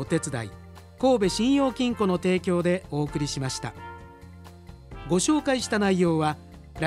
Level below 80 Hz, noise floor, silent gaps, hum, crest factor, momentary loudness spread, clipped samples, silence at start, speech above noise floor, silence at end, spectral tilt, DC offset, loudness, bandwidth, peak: -50 dBFS; -45 dBFS; none; none; 16 dB; 20 LU; under 0.1%; 0 s; 21 dB; 0 s; -5 dB/octave; under 0.1%; -25 LUFS; 14 kHz; -8 dBFS